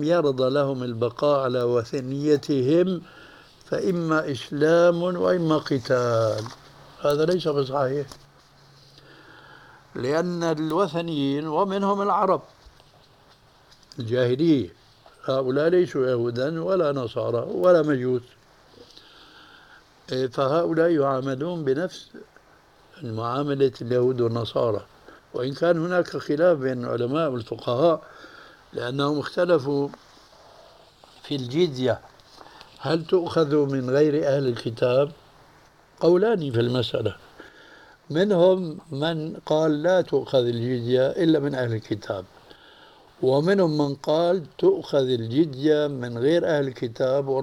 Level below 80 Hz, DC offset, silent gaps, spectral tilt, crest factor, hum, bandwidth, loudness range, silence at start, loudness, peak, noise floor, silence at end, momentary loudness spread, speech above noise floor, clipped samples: -62 dBFS; under 0.1%; none; -7 dB/octave; 16 dB; none; 15 kHz; 5 LU; 0 s; -23 LUFS; -8 dBFS; -55 dBFS; 0 s; 10 LU; 33 dB; under 0.1%